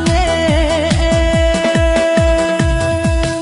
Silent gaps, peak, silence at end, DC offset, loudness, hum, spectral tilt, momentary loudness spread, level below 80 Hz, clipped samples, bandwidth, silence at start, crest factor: none; 0 dBFS; 0 s; under 0.1%; -14 LUFS; none; -5.5 dB/octave; 3 LU; -20 dBFS; under 0.1%; 11.5 kHz; 0 s; 12 dB